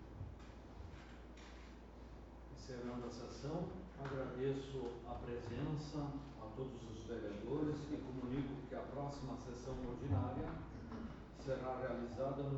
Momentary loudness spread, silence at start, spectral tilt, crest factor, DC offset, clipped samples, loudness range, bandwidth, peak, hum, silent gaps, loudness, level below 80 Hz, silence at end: 14 LU; 0 s; -7.5 dB/octave; 18 dB; under 0.1%; under 0.1%; 6 LU; 8 kHz; -28 dBFS; none; none; -46 LUFS; -58 dBFS; 0 s